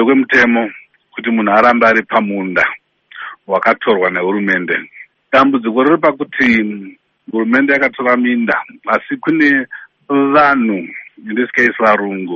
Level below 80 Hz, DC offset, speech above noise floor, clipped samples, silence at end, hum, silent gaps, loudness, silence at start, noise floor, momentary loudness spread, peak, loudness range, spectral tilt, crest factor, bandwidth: -56 dBFS; under 0.1%; 19 dB; under 0.1%; 0 s; none; none; -13 LUFS; 0 s; -32 dBFS; 13 LU; 0 dBFS; 2 LU; -6.5 dB/octave; 14 dB; 7 kHz